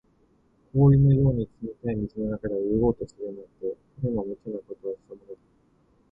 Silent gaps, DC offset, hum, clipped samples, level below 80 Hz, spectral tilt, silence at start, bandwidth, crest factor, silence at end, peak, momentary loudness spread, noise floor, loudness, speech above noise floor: none; under 0.1%; none; under 0.1%; -46 dBFS; -12 dB/octave; 0.75 s; 3.7 kHz; 18 dB; 0.75 s; -8 dBFS; 18 LU; -64 dBFS; -26 LUFS; 38 dB